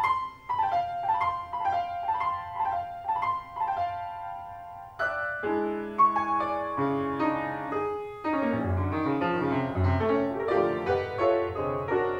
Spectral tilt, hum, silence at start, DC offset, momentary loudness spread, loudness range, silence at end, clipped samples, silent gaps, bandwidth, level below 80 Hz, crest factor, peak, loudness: -8 dB/octave; none; 0 s; under 0.1%; 7 LU; 4 LU; 0 s; under 0.1%; none; 11 kHz; -54 dBFS; 16 dB; -12 dBFS; -28 LUFS